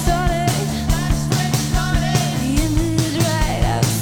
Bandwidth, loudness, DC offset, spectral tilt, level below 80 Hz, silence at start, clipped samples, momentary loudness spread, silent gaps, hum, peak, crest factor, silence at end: over 20 kHz; -19 LUFS; under 0.1%; -5 dB/octave; -24 dBFS; 0 s; under 0.1%; 2 LU; none; none; 0 dBFS; 16 dB; 0 s